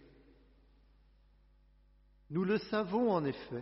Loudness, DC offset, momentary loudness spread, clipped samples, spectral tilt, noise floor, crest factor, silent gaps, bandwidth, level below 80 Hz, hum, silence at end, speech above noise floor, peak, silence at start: -34 LUFS; under 0.1%; 7 LU; under 0.1%; -6 dB/octave; -66 dBFS; 18 dB; none; 5.8 kHz; -66 dBFS; 50 Hz at -65 dBFS; 0 s; 32 dB; -20 dBFS; 2.3 s